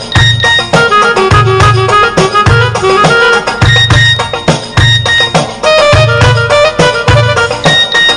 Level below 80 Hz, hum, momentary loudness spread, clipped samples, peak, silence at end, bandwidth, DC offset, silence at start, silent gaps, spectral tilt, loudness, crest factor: -26 dBFS; none; 3 LU; 0.8%; 0 dBFS; 0 s; 11.5 kHz; under 0.1%; 0 s; none; -4.5 dB/octave; -6 LUFS; 6 dB